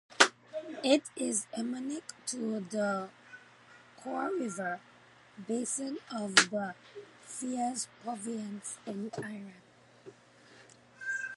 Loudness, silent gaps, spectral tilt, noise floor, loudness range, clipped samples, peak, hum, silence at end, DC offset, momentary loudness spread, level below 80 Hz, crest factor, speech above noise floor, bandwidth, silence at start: -33 LUFS; none; -2 dB/octave; -59 dBFS; 7 LU; under 0.1%; -4 dBFS; none; 0 s; under 0.1%; 20 LU; -82 dBFS; 32 dB; 24 dB; 11.5 kHz; 0.1 s